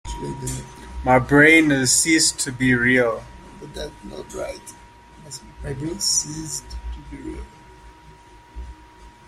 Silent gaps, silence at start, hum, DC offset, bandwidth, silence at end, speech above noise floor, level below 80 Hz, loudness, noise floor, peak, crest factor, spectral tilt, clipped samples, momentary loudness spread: none; 0.05 s; none; under 0.1%; 16 kHz; 0.2 s; 26 dB; -40 dBFS; -18 LUFS; -47 dBFS; -2 dBFS; 20 dB; -3 dB/octave; under 0.1%; 24 LU